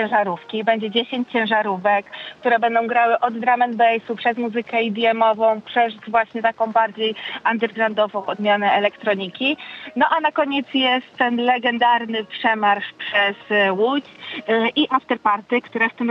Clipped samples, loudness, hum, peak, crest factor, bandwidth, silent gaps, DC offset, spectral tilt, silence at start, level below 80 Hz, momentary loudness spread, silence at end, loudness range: under 0.1%; -20 LUFS; none; -4 dBFS; 16 dB; 6.4 kHz; none; under 0.1%; -6.5 dB/octave; 0 s; -70 dBFS; 6 LU; 0 s; 1 LU